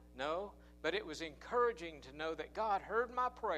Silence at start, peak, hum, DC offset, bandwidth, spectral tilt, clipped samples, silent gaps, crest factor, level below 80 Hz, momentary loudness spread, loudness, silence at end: 0 s; -24 dBFS; 60 Hz at -60 dBFS; under 0.1%; 12 kHz; -4 dB/octave; under 0.1%; none; 16 dB; -62 dBFS; 10 LU; -39 LUFS; 0 s